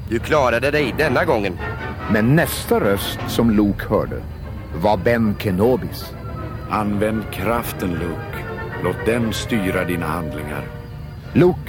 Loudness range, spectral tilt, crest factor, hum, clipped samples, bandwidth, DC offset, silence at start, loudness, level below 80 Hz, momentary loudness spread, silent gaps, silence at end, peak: 5 LU; -6 dB/octave; 16 dB; none; under 0.1%; 18 kHz; under 0.1%; 0 s; -20 LUFS; -36 dBFS; 13 LU; none; 0 s; -4 dBFS